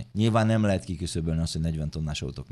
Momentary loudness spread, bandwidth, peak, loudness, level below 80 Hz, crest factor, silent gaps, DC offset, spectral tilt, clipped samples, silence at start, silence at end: 9 LU; 12 kHz; -10 dBFS; -27 LUFS; -40 dBFS; 16 dB; none; under 0.1%; -6.5 dB/octave; under 0.1%; 0 s; 0.05 s